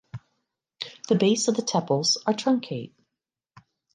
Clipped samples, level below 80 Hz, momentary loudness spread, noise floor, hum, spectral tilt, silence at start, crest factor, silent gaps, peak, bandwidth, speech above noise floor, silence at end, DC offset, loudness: under 0.1%; -70 dBFS; 19 LU; -86 dBFS; none; -4.5 dB/octave; 0.15 s; 18 dB; none; -8 dBFS; 11 kHz; 63 dB; 1.05 s; under 0.1%; -24 LUFS